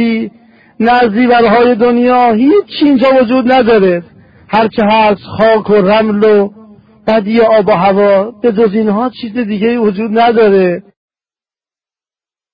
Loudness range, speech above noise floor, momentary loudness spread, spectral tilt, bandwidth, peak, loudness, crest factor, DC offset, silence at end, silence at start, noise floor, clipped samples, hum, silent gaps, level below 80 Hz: 4 LU; over 81 dB; 7 LU; -9 dB/octave; 5.2 kHz; 0 dBFS; -9 LUFS; 10 dB; under 0.1%; 1.75 s; 0 s; under -90 dBFS; under 0.1%; none; none; -46 dBFS